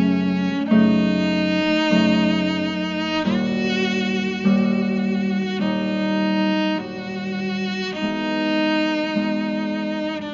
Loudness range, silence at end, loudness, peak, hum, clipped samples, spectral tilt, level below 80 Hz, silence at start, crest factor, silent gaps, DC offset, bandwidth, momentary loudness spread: 4 LU; 0 s; -21 LUFS; -6 dBFS; none; under 0.1%; -4.5 dB/octave; -58 dBFS; 0 s; 16 dB; none; under 0.1%; 7.4 kHz; 7 LU